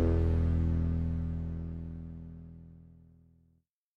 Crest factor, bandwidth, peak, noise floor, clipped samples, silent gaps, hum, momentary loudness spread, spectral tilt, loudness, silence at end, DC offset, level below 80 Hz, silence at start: 16 dB; 3.4 kHz; -18 dBFS; -73 dBFS; under 0.1%; none; none; 21 LU; -11 dB/octave; -33 LUFS; 1.1 s; under 0.1%; -38 dBFS; 0 s